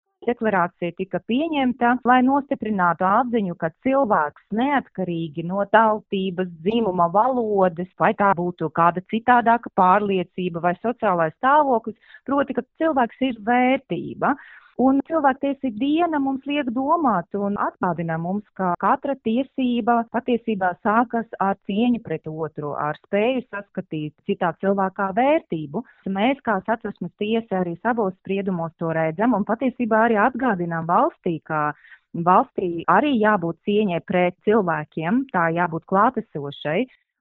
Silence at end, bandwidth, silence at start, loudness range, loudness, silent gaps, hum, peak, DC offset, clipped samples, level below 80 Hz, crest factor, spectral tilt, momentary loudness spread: 0.35 s; 4.1 kHz; 0.2 s; 4 LU; -22 LUFS; none; none; 0 dBFS; under 0.1%; under 0.1%; -60 dBFS; 20 dB; -5 dB/octave; 10 LU